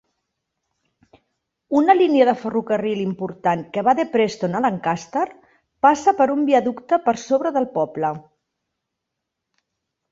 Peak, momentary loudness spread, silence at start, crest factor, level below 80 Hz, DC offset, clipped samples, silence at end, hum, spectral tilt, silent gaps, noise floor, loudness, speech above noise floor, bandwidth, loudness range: -2 dBFS; 9 LU; 1.7 s; 20 dB; -64 dBFS; under 0.1%; under 0.1%; 1.9 s; none; -6 dB/octave; none; -81 dBFS; -20 LUFS; 62 dB; 7.8 kHz; 3 LU